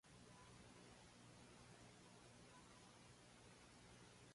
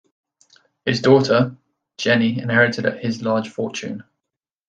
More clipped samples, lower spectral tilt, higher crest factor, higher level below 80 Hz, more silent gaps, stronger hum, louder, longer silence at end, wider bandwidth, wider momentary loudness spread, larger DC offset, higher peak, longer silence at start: neither; second, -3.5 dB/octave vs -5.5 dB/octave; about the same, 14 dB vs 18 dB; second, -78 dBFS vs -62 dBFS; neither; first, 60 Hz at -70 dBFS vs none; second, -65 LUFS vs -19 LUFS; second, 0 s vs 0.65 s; first, 11.5 kHz vs 9 kHz; second, 1 LU vs 12 LU; neither; second, -52 dBFS vs -2 dBFS; second, 0.05 s vs 0.85 s